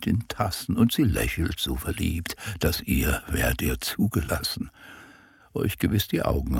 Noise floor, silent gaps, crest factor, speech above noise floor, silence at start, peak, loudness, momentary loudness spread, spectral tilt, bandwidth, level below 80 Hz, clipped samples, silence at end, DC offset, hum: -53 dBFS; none; 18 dB; 27 dB; 0 s; -8 dBFS; -26 LUFS; 8 LU; -5 dB/octave; 17.5 kHz; -36 dBFS; under 0.1%; 0 s; under 0.1%; none